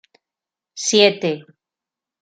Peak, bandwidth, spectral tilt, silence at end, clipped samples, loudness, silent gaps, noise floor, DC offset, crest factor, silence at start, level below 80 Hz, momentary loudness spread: -2 dBFS; 9.4 kHz; -2.5 dB/octave; 0.8 s; under 0.1%; -17 LUFS; none; -88 dBFS; under 0.1%; 20 dB; 0.75 s; -72 dBFS; 18 LU